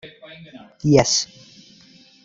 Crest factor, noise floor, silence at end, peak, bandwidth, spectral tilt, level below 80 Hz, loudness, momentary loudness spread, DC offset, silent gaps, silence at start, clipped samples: 22 dB; -50 dBFS; 1 s; -2 dBFS; 8 kHz; -4 dB/octave; -50 dBFS; -18 LUFS; 26 LU; under 0.1%; none; 0.05 s; under 0.1%